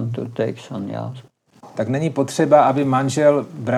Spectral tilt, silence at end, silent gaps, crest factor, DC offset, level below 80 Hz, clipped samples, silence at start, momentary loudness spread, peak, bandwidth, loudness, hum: -6.5 dB/octave; 0 s; none; 18 dB; under 0.1%; -76 dBFS; under 0.1%; 0 s; 16 LU; -2 dBFS; 13 kHz; -19 LUFS; none